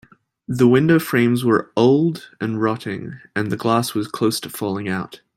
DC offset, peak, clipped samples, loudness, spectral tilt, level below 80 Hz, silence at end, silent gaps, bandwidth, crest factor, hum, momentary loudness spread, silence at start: under 0.1%; -2 dBFS; under 0.1%; -19 LUFS; -6 dB/octave; -60 dBFS; 0.2 s; none; 16.5 kHz; 16 dB; none; 12 LU; 0.5 s